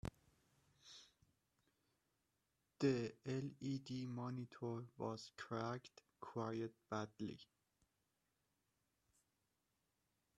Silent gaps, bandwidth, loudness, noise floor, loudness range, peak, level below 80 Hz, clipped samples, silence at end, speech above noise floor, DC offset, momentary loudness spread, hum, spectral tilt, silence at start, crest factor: none; 12.5 kHz; -47 LUFS; -87 dBFS; 7 LU; -26 dBFS; -76 dBFS; under 0.1%; 2.95 s; 41 dB; under 0.1%; 19 LU; none; -6.5 dB/octave; 0.05 s; 24 dB